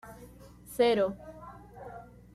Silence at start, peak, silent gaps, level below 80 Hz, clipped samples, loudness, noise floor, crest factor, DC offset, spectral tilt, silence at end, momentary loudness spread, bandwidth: 0.05 s; -14 dBFS; none; -58 dBFS; under 0.1%; -28 LUFS; -51 dBFS; 18 dB; under 0.1%; -5 dB/octave; 0.35 s; 25 LU; 14.5 kHz